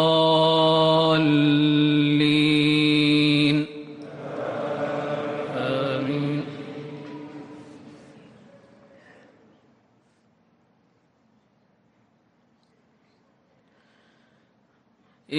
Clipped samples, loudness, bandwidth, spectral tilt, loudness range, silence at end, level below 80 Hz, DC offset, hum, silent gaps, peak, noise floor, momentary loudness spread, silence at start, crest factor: under 0.1%; -21 LUFS; 10.5 kHz; -6.5 dB/octave; 19 LU; 0 s; -64 dBFS; under 0.1%; none; none; -8 dBFS; -64 dBFS; 20 LU; 0 s; 16 dB